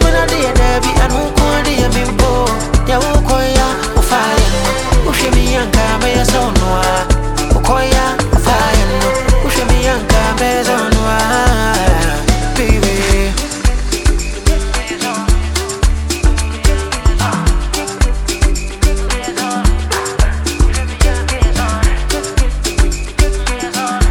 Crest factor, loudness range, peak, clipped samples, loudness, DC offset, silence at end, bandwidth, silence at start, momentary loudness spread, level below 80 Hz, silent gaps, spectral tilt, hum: 12 dB; 3 LU; 0 dBFS; under 0.1%; -14 LUFS; under 0.1%; 0 s; 17.5 kHz; 0 s; 4 LU; -14 dBFS; none; -4.5 dB/octave; none